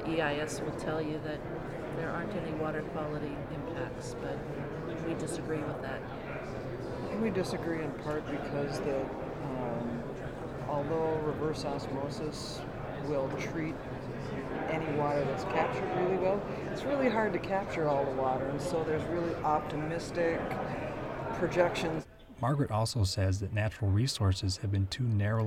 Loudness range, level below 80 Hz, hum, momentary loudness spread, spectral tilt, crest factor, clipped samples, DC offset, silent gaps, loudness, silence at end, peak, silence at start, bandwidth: 6 LU; -52 dBFS; none; 9 LU; -6 dB/octave; 22 dB; under 0.1%; under 0.1%; none; -34 LUFS; 0 s; -12 dBFS; 0 s; 15 kHz